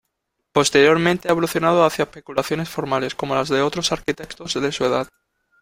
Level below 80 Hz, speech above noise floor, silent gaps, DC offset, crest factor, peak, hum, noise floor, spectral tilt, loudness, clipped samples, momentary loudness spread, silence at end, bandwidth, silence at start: -52 dBFS; 56 dB; none; under 0.1%; 18 dB; -2 dBFS; none; -76 dBFS; -4 dB/octave; -20 LUFS; under 0.1%; 11 LU; 0.55 s; 16.5 kHz; 0.55 s